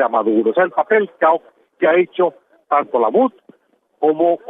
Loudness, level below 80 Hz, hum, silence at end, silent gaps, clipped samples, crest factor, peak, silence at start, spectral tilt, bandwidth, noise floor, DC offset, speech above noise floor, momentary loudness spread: -17 LUFS; -70 dBFS; none; 0 s; none; under 0.1%; 14 dB; -2 dBFS; 0 s; -9 dB/octave; 3.9 kHz; -56 dBFS; under 0.1%; 40 dB; 5 LU